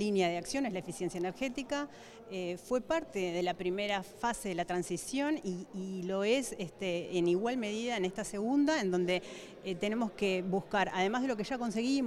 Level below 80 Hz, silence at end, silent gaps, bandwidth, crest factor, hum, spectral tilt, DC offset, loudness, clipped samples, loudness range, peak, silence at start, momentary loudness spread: -64 dBFS; 0 s; none; 13.5 kHz; 16 dB; none; -4.5 dB/octave; under 0.1%; -34 LUFS; under 0.1%; 3 LU; -18 dBFS; 0 s; 8 LU